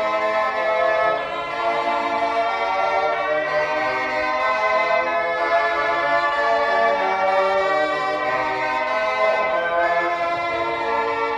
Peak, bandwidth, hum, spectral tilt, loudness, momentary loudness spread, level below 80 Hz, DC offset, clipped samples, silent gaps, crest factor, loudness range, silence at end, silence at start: -6 dBFS; 11 kHz; none; -3.5 dB/octave; -20 LUFS; 3 LU; -56 dBFS; under 0.1%; under 0.1%; none; 14 dB; 2 LU; 0 s; 0 s